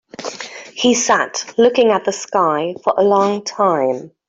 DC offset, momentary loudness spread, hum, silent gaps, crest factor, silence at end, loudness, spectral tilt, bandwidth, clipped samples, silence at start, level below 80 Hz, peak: under 0.1%; 14 LU; none; none; 14 dB; 0.2 s; -16 LUFS; -3 dB/octave; 8 kHz; under 0.1%; 0.2 s; -62 dBFS; -2 dBFS